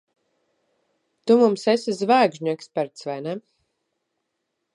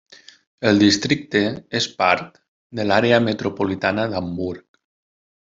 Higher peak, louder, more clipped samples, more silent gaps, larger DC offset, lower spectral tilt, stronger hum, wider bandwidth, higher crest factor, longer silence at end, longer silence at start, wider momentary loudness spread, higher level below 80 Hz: about the same, -4 dBFS vs -2 dBFS; about the same, -21 LUFS vs -20 LUFS; neither; second, none vs 2.48-2.70 s; neither; about the same, -5.5 dB/octave vs -4.5 dB/octave; neither; first, 11 kHz vs 7.8 kHz; about the same, 20 dB vs 20 dB; first, 1.35 s vs 0.95 s; first, 1.25 s vs 0.6 s; about the same, 14 LU vs 12 LU; second, -80 dBFS vs -58 dBFS